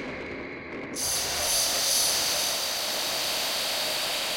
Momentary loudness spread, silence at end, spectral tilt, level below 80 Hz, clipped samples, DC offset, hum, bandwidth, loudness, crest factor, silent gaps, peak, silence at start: 14 LU; 0 s; 0 dB/octave; -56 dBFS; under 0.1%; under 0.1%; none; 16.5 kHz; -25 LUFS; 16 dB; none; -12 dBFS; 0 s